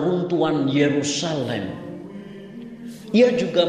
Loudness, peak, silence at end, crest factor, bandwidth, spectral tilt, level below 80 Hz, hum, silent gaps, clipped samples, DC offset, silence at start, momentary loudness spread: -21 LUFS; -4 dBFS; 0 s; 18 dB; 11.5 kHz; -5 dB/octave; -62 dBFS; none; none; under 0.1%; under 0.1%; 0 s; 20 LU